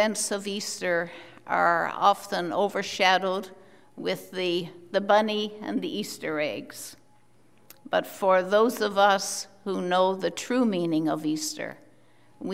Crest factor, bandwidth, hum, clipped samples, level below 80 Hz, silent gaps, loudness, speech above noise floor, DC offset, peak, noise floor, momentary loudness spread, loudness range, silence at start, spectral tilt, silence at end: 22 dB; 16 kHz; none; under 0.1%; -76 dBFS; none; -26 LUFS; 36 dB; 0.1%; -6 dBFS; -62 dBFS; 12 LU; 4 LU; 0 s; -3.5 dB/octave; 0 s